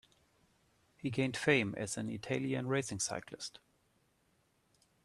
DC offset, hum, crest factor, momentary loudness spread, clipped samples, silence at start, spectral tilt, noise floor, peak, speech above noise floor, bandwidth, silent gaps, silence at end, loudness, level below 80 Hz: under 0.1%; none; 24 dB; 13 LU; under 0.1%; 1.05 s; -4.5 dB/octave; -75 dBFS; -14 dBFS; 39 dB; 13 kHz; none; 1.45 s; -36 LUFS; -72 dBFS